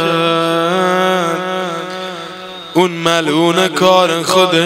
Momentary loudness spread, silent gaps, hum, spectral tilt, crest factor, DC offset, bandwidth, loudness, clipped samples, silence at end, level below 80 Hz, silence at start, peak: 13 LU; none; none; -4 dB/octave; 14 dB; under 0.1%; 16.5 kHz; -13 LUFS; 0.2%; 0 s; -60 dBFS; 0 s; 0 dBFS